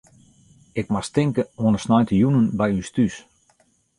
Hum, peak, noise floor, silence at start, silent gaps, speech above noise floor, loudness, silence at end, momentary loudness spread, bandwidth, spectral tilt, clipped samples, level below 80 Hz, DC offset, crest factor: none; -6 dBFS; -62 dBFS; 0.75 s; none; 42 dB; -21 LUFS; 0.8 s; 9 LU; 11.5 kHz; -7 dB/octave; under 0.1%; -50 dBFS; under 0.1%; 16 dB